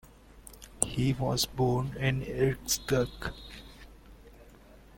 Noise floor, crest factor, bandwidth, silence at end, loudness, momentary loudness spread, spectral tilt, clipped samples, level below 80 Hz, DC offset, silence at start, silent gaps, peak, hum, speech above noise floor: -54 dBFS; 30 dB; 17 kHz; 0.2 s; -30 LUFS; 21 LU; -4.5 dB/octave; under 0.1%; -48 dBFS; under 0.1%; 0.35 s; none; -4 dBFS; none; 24 dB